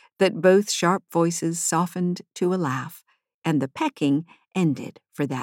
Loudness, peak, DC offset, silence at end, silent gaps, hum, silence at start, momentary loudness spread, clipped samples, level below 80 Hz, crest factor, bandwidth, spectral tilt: -24 LUFS; -6 dBFS; under 0.1%; 0 s; 3.34-3.42 s; none; 0.2 s; 12 LU; under 0.1%; -78 dBFS; 18 dB; 17 kHz; -5 dB/octave